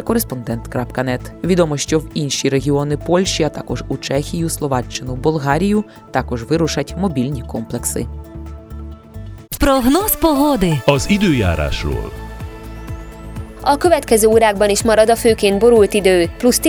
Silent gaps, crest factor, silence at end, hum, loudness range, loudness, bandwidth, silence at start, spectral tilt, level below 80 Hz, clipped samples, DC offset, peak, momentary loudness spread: none; 16 dB; 0 s; none; 6 LU; -16 LUFS; over 20 kHz; 0 s; -5 dB/octave; -32 dBFS; under 0.1%; under 0.1%; 0 dBFS; 19 LU